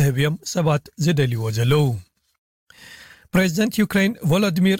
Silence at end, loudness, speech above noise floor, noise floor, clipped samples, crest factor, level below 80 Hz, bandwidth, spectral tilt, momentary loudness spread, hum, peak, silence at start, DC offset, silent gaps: 0 s; -20 LUFS; 25 dB; -45 dBFS; under 0.1%; 12 dB; -50 dBFS; 16.5 kHz; -6 dB/octave; 4 LU; none; -8 dBFS; 0 s; under 0.1%; 2.38-2.67 s